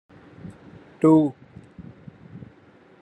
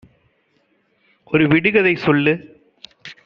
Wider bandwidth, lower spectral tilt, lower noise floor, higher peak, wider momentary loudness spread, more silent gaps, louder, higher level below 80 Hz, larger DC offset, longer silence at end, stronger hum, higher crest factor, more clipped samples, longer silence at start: first, 8.8 kHz vs 6.4 kHz; first, -9.5 dB/octave vs -5 dB/octave; second, -53 dBFS vs -63 dBFS; second, -6 dBFS vs -2 dBFS; first, 27 LU vs 18 LU; neither; second, -20 LUFS vs -16 LUFS; second, -62 dBFS vs -56 dBFS; neither; first, 0.65 s vs 0.15 s; neither; about the same, 20 dB vs 18 dB; neither; second, 0.45 s vs 1.3 s